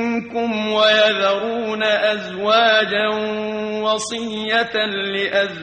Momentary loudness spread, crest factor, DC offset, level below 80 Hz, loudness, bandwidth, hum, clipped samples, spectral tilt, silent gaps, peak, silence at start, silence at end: 9 LU; 14 dB; under 0.1%; -62 dBFS; -18 LUFS; 9.4 kHz; none; under 0.1%; -3 dB/octave; none; -4 dBFS; 0 s; 0 s